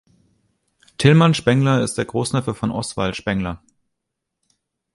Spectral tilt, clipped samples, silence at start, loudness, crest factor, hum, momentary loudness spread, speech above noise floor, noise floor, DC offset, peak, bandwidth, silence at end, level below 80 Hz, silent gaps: -6 dB/octave; under 0.1%; 1 s; -19 LUFS; 20 dB; none; 11 LU; 62 dB; -79 dBFS; under 0.1%; 0 dBFS; 11.5 kHz; 1.4 s; -46 dBFS; none